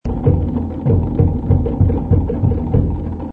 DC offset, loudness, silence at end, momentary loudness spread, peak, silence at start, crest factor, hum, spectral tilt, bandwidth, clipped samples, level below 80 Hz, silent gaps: under 0.1%; -17 LUFS; 0 s; 5 LU; 0 dBFS; 0.05 s; 14 dB; none; -12.5 dB/octave; 3.1 kHz; under 0.1%; -24 dBFS; none